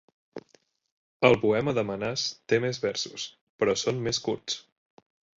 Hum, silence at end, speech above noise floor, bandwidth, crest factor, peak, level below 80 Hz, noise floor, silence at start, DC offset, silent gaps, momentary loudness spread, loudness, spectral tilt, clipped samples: none; 0.8 s; 38 dB; 8 kHz; 24 dB; -4 dBFS; -60 dBFS; -65 dBFS; 0.35 s; under 0.1%; 0.92-1.20 s, 3.41-3.59 s; 16 LU; -27 LUFS; -4 dB/octave; under 0.1%